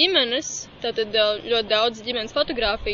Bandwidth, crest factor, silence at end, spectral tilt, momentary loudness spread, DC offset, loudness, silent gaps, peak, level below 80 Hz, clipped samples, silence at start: 7.6 kHz; 18 dB; 0 s; -2 dB/octave; 8 LU; under 0.1%; -22 LUFS; none; -4 dBFS; -44 dBFS; under 0.1%; 0 s